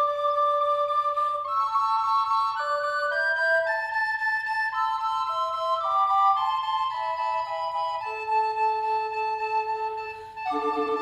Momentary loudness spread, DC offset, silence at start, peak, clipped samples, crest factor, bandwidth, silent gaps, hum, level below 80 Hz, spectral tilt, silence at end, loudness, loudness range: 6 LU; under 0.1%; 0 s; -12 dBFS; under 0.1%; 14 dB; 13 kHz; none; none; -66 dBFS; -2.5 dB/octave; 0 s; -25 LUFS; 3 LU